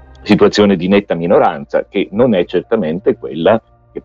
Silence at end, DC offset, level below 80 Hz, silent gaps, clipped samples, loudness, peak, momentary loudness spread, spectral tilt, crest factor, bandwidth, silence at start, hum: 0.05 s; under 0.1%; -44 dBFS; none; under 0.1%; -13 LUFS; 0 dBFS; 7 LU; -6.5 dB/octave; 14 dB; 7.8 kHz; 0.25 s; none